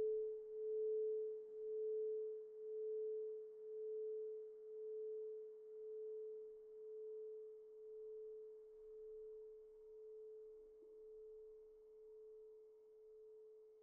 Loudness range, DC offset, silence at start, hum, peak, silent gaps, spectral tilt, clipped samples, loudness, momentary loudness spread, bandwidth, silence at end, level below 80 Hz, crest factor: 14 LU; under 0.1%; 0 s; none; -36 dBFS; none; -4.5 dB/octave; under 0.1%; -50 LUFS; 18 LU; 1.5 kHz; 0 s; -86 dBFS; 14 dB